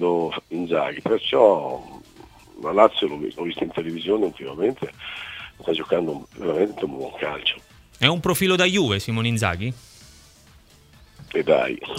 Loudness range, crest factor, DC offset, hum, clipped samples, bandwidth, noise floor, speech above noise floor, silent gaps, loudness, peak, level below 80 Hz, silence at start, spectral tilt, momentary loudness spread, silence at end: 5 LU; 24 dB; under 0.1%; none; under 0.1%; 16 kHz; -52 dBFS; 30 dB; none; -22 LUFS; 0 dBFS; -54 dBFS; 0 s; -5 dB/octave; 14 LU; 0 s